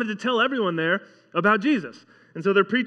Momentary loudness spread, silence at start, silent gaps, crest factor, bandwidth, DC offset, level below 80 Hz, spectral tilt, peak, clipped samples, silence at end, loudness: 9 LU; 0 s; none; 18 dB; 9 kHz; under 0.1%; -82 dBFS; -6 dB/octave; -6 dBFS; under 0.1%; 0 s; -23 LUFS